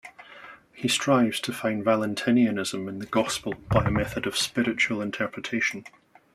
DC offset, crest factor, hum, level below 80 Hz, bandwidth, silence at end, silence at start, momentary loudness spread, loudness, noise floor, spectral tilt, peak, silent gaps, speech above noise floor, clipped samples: under 0.1%; 20 dB; none; -48 dBFS; 15 kHz; 0.45 s; 0.05 s; 13 LU; -25 LUFS; -47 dBFS; -4.5 dB/octave; -6 dBFS; none; 22 dB; under 0.1%